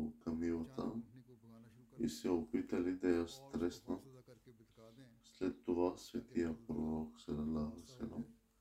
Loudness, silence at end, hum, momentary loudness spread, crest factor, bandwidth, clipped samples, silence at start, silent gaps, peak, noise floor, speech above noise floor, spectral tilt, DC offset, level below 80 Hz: -42 LUFS; 0.3 s; none; 23 LU; 20 dB; 15.5 kHz; under 0.1%; 0 s; none; -22 dBFS; -64 dBFS; 23 dB; -6.5 dB/octave; under 0.1%; -64 dBFS